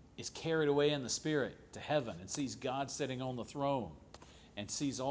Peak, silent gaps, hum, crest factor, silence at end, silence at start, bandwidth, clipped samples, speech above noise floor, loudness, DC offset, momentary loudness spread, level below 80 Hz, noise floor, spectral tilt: -20 dBFS; none; none; 18 dB; 0 s; 0 s; 8 kHz; under 0.1%; 21 dB; -37 LUFS; under 0.1%; 16 LU; -64 dBFS; -58 dBFS; -4.5 dB/octave